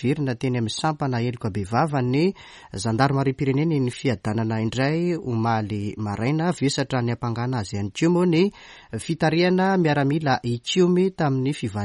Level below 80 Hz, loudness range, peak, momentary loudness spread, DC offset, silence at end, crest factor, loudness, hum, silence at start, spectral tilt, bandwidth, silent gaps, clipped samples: -54 dBFS; 3 LU; -4 dBFS; 8 LU; under 0.1%; 0 s; 18 dB; -23 LUFS; none; 0 s; -6.5 dB/octave; 11.5 kHz; none; under 0.1%